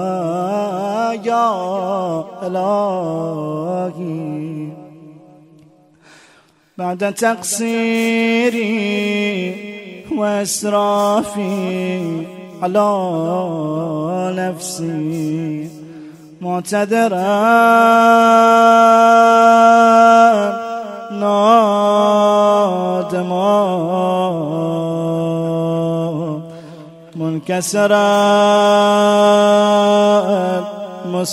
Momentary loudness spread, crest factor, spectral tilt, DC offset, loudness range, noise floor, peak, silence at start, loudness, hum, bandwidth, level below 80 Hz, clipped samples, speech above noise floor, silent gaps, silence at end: 16 LU; 14 dB; -5 dB/octave; under 0.1%; 12 LU; -52 dBFS; 0 dBFS; 0 s; -15 LUFS; none; 15 kHz; -64 dBFS; under 0.1%; 38 dB; none; 0 s